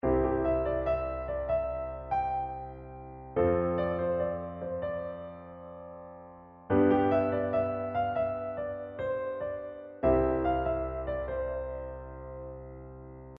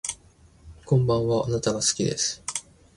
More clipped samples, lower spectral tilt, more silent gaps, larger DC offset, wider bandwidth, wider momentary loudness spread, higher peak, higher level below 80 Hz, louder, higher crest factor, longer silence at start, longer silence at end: neither; first, -7.5 dB/octave vs -4.5 dB/octave; neither; neither; second, 5 kHz vs 11.5 kHz; first, 19 LU vs 11 LU; second, -14 dBFS vs -10 dBFS; about the same, -46 dBFS vs -50 dBFS; second, -31 LUFS vs -25 LUFS; about the same, 18 dB vs 16 dB; about the same, 0.05 s vs 0.05 s; second, 0 s vs 0.35 s